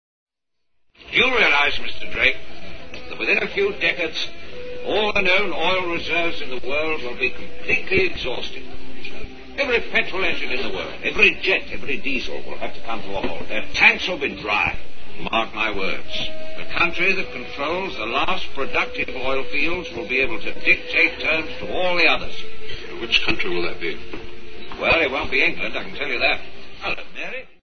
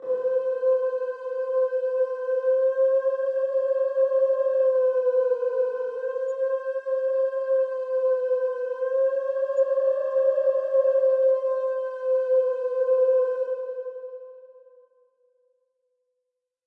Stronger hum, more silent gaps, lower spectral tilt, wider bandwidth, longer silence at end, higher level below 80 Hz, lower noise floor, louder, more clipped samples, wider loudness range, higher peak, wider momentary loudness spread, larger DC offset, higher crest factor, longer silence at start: neither; neither; about the same, -4 dB/octave vs -3.5 dB/octave; first, 6.6 kHz vs 3.3 kHz; second, 0 s vs 2.2 s; first, -42 dBFS vs under -90 dBFS; second, -71 dBFS vs -82 dBFS; first, -21 LUFS vs -24 LUFS; neither; about the same, 3 LU vs 4 LU; first, 0 dBFS vs -12 dBFS; first, 17 LU vs 7 LU; first, 7% vs under 0.1%; first, 22 dB vs 12 dB; first, 0.25 s vs 0 s